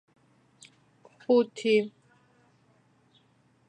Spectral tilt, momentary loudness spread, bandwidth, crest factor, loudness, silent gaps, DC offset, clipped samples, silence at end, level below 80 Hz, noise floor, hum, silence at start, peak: -5 dB/octave; 16 LU; 10 kHz; 20 dB; -26 LUFS; none; under 0.1%; under 0.1%; 1.8 s; -84 dBFS; -66 dBFS; none; 1.3 s; -12 dBFS